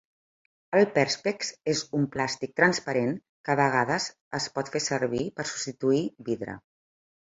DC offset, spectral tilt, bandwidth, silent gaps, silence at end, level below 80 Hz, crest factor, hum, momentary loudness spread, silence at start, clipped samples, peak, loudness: under 0.1%; -4 dB/octave; 8 kHz; 3.29-3.44 s, 4.21-4.31 s; 0.7 s; -66 dBFS; 22 dB; none; 9 LU; 0.7 s; under 0.1%; -6 dBFS; -27 LUFS